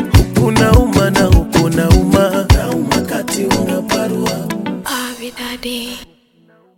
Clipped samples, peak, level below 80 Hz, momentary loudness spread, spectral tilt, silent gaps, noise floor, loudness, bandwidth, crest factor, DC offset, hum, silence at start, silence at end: under 0.1%; 0 dBFS; -22 dBFS; 13 LU; -5.5 dB/octave; none; -51 dBFS; -14 LUFS; 17 kHz; 14 dB; under 0.1%; none; 0 s; 0.75 s